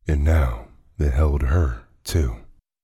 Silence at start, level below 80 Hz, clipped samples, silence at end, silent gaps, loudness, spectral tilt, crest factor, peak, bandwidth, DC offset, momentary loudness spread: 0.05 s; -24 dBFS; under 0.1%; 0.4 s; none; -22 LUFS; -7 dB/octave; 14 dB; -8 dBFS; 13 kHz; under 0.1%; 13 LU